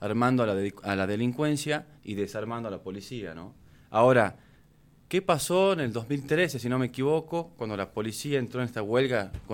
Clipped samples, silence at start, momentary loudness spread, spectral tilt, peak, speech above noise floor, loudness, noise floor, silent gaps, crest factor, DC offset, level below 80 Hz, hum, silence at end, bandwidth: under 0.1%; 0 s; 12 LU; -5.5 dB/octave; -8 dBFS; 31 dB; -28 LUFS; -58 dBFS; none; 20 dB; under 0.1%; -58 dBFS; none; 0 s; 17.5 kHz